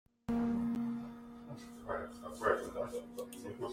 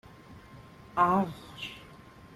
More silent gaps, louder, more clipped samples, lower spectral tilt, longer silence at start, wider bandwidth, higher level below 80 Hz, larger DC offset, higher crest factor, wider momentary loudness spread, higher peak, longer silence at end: neither; second, -39 LUFS vs -30 LUFS; neither; about the same, -6 dB/octave vs -6.5 dB/octave; about the same, 0.3 s vs 0.3 s; first, 16 kHz vs 14 kHz; about the same, -62 dBFS vs -60 dBFS; neither; about the same, 24 dB vs 22 dB; second, 15 LU vs 26 LU; second, -16 dBFS vs -12 dBFS; about the same, 0 s vs 0.1 s